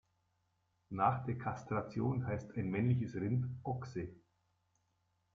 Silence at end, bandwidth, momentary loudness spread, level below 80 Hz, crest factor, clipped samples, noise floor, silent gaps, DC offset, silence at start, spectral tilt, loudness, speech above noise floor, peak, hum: 1.15 s; 7 kHz; 10 LU; -68 dBFS; 22 dB; under 0.1%; -80 dBFS; none; under 0.1%; 0.9 s; -9 dB/octave; -38 LUFS; 43 dB; -16 dBFS; none